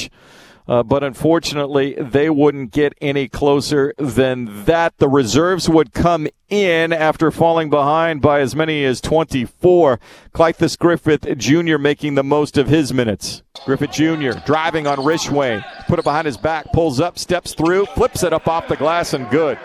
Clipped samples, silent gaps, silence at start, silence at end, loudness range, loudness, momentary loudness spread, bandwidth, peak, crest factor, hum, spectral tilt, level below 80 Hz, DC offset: under 0.1%; none; 0 s; 0 s; 3 LU; -16 LUFS; 6 LU; 14 kHz; 0 dBFS; 16 dB; none; -5.5 dB/octave; -40 dBFS; under 0.1%